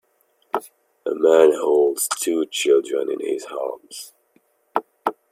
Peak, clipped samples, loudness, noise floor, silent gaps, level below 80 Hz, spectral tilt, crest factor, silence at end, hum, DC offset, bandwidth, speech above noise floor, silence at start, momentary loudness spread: -2 dBFS; under 0.1%; -21 LUFS; -64 dBFS; none; -72 dBFS; -2 dB/octave; 20 dB; 0.2 s; none; under 0.1%; 16 kHz; 45 dB; 0.55 s; 16 LU